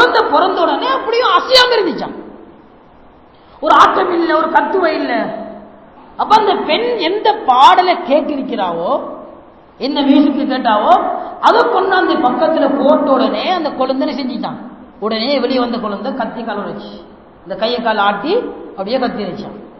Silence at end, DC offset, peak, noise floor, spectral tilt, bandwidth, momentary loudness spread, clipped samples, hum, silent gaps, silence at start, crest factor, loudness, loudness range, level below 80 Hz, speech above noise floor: 0 s; 0.2%; 0 dBFS; -43 dBFS; -4.5 dB/octave; 8 kHz; 15 LU; 0.3%; none; none; 0 s; 14 dB; -13 LUFS; 6 LU; -52 dBFS; 29 dB